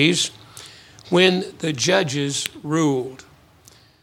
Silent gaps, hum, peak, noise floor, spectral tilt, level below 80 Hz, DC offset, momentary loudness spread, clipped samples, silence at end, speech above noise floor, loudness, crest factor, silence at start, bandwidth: none; none; 0 dBFS; -51 dBFS; -4 dB/octave; -62 dBFS; under 0.1%; 23 LU; under 0.1%; 0.85 s; 31 dB; -20 LUFS; 22 dB; 0 s; 19 kHz